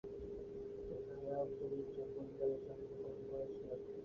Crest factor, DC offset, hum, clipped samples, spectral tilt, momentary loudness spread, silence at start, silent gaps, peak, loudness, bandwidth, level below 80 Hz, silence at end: 16 dB; under 0.1%; none; under 0.1%; -8.5 dB/octave; 7 LU; 0.05 s; none; -30 dBFS; -46 LUFS; 6.8 kHz; -66 dBFS; 0 s